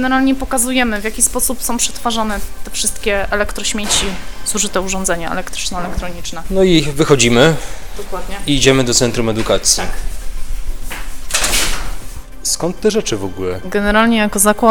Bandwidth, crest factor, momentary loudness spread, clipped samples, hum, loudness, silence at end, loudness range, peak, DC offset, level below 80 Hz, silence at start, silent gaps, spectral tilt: 19.5 kHz; 16 dB; 16 LU; under 0.1%; none; -15 LUFS; 0 s; 5 LU; 0 dBFS; 7%; -26 dBFS; 0 s; none; -3 dB/octave